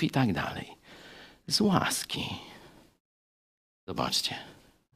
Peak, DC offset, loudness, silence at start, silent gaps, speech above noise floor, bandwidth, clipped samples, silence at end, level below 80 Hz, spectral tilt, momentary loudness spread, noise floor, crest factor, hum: -8 dBFS; under 0.1%; -29 LUFS; 0 s; 3.00-3.87 s; 24 dB; 15.5 kHz; under 0.1%; 0.45 s; -60 dBFS; -4 dB/octave; 24 LU; -54 dBFS; 24 dB; none